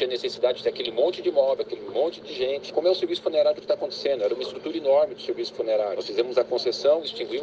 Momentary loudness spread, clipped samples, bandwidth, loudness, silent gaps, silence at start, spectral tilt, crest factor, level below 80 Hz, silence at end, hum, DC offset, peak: 7 LU; under 0.1%; 7.8 kHz; -25 LUFS; none; 0 s; -4 dB/octave; 16 dB; -70 dBFS; 0 s; none; under 0.1%; -8 dBFS